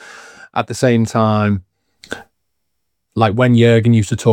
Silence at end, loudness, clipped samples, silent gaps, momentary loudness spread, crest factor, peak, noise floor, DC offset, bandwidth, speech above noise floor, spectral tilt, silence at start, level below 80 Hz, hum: 0 s; -14 LUFS; under 0.1%; none; 20 LU; 16 dB; 0 dBFS; -74 dBFS; under 0.1%; 11 kHz; 62 dB; -7 dB/octave; 0.1 s; -54 dBFS; none